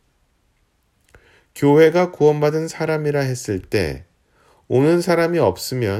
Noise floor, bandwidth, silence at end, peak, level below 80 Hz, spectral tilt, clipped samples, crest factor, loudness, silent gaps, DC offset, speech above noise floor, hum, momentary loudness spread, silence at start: -63 dBFS; 16 kHz; 0 s; -2 dBFS; -48 dBFS; -6.5 dB/octave; under 0.1%; 16 dB; -18 LUFS; none; under 0.1%; 46 dB; none; 10 LU; 1.55 s